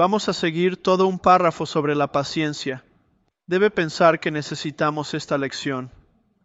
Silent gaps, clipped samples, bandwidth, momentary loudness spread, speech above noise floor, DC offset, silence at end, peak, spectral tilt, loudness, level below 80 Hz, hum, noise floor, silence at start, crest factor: none; under 0.1%; 8 kHz; 12 LU; 45 dB; under 0.1%; 0.55 s; -2 dBFS; -5.5 dB/octave; -21 LUFS; -58 dBFS; none; -66 dBFS; 0 s; 20 dB